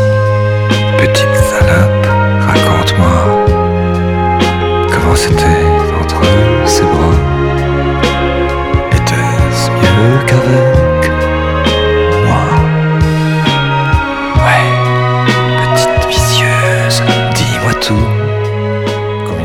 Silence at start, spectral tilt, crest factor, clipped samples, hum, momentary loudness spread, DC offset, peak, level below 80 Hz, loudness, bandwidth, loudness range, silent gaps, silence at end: 0 s; -5.5 dB/octave; 10 dB; 0.2%; none; 4 LU; under 0.1%; 0 dBFS; -22 dBFS; -10 LUFS; 16.5 kHz; 1 LU; none; 0 s